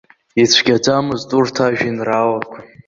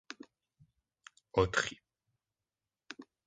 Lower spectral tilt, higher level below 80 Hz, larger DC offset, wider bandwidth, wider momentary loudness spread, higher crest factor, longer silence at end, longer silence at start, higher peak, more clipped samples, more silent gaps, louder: about the same, -4 dB/octave vs -4 dB/octave; about the same, -54 dBFS vs -58 dBFS; neither; second, 7.6 kHz vs 9.6 kHz; second, 9 LU vs 21 LU; second, 16 dB vs 26 dB; about the same, 0.2 s vs 0.25 s; first, 0.35 s vs 0.1 s; first, 0 dBFS vs -14 dBFS; neither; neither; first, -15 LUFS vs -33 LUFS